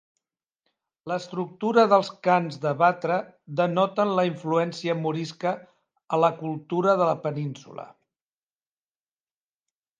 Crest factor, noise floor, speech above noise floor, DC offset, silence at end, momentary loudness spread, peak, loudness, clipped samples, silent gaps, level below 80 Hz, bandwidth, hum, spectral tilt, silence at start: 22 dB; under -90 dBFS; over 66 dB; under 0.1%; 2.15 s; 12 LU; -6 dBFS; -25 LUFS; under 0.1%; none; -78 dBFS; 9.4 kHz; none; -6.5 dB/octave; 1.05 s